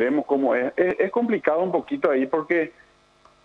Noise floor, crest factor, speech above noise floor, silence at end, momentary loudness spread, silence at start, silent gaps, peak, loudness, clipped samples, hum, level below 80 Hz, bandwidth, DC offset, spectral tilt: -57 dBFS; 16 dB; 35 dB; 0.75 s; 3 LU; 0 s; none; -6 dBFS; -23 LUFS; under 0.1%; 50 Hz at -60 dBFS; -66 dBFS; 6.6 kHz; under 0.1%; -8 dB/octave